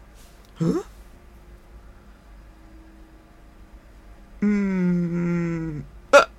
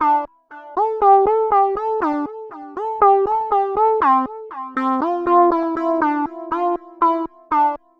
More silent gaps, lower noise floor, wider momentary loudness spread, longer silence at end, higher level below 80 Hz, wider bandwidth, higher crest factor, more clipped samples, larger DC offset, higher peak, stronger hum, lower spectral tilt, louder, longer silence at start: neither; first, -48 dBFS vs -40 dBFS; about the same, 14 LU vs 13 LU; second, 0.05 s vs 0.25 s; first, -46 dBFS vs -54 dBFS; first, 12.5 kHz vs 6 kHz; first, 26 dB vs 16 dB; neither; neither; first, 0 dBFS vs -4 dBFS; neither; about the same, -6.5 dB/octave vs -7 dB/octave; second, -23 LUFS vs -18 LUFS; first, 0.6 s vs 0 s